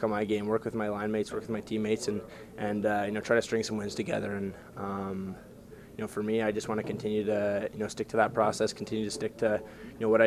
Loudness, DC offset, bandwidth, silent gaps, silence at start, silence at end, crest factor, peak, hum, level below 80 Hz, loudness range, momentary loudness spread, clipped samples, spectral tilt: -31 LUFS; under 0.1%; 15 kHz; none; 0 s; 0 s; 22 dB; -10 dBFS; none; -60 dBFS; 4 LU; 11 LU; under 0.1%; -5.5 dB/octave